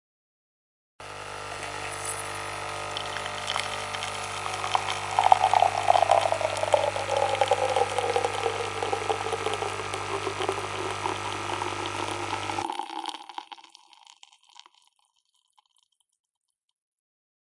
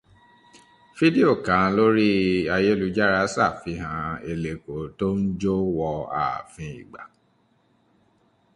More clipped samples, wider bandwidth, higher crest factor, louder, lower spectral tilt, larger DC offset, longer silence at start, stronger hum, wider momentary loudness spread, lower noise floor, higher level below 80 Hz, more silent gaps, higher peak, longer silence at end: neither; about the same, 11.5 kHz vs 11 kHz; first, 28 dB vs 20 dB; second, -27 LUFS vs -23 LUFS; second, -3 dB/octave vs -6.5 dB/octave; neither; about the same, 1 s vs 0.95 s; neither; about the same, 13 LU vs 15 LU; first, -72 dBFS vs -64 dBFS; second, -58 dBFS vs -50 dBFS; neither; first, 0 dBFS vs -4 dBFS; first, 2.9 s vs 1.5 s